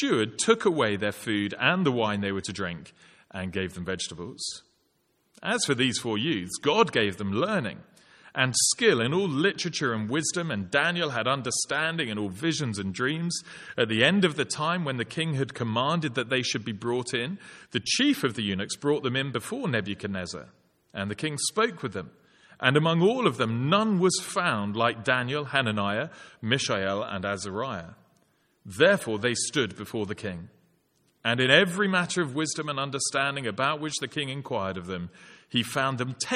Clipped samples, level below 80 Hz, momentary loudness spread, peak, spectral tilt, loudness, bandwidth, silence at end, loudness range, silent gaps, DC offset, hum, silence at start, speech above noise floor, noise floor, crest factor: under 0.1%; -66 dBFS; 12 LU; -4 dBFS; -4 dB/octave; -27 LUFS; 15.5 kHz; 0 s; 5 LU; none; under 0.1%; none; 0 s; 44 dB; -71 dBFS; 24 dB